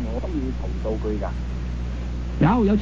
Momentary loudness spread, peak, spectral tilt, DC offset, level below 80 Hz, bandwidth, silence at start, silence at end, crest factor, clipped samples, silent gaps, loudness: 11 LU; -6 dBFS; -8.5 dB/octave; under 0.1%; -28 dBFS; 7.6 kHz; 0 s; 0 s; 16 dB; under 0.1%; none; -25 LUFS